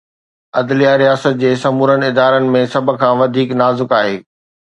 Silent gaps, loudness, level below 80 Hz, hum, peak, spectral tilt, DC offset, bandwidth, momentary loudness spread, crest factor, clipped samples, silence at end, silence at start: none; -13 LUFS; -60 dBFS; none; 0 dBFS; -6.5 dB/octave; under 0.1%; 9.2 kHz; 5 LU; 14 dB; under 0.1%; 0.5 s; 0.55 s